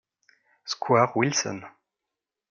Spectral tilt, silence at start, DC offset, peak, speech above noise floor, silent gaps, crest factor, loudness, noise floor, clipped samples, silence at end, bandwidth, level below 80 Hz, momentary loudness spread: -4 dB/octave; 0.65 s; under 0.1%; -6 dBFS; 62 dB; none; 22 dB; -24 LUFS; -87 dBFS; under 0.1%; 0.8 s; 10.5 kHz; -76 dBFS; 17 LU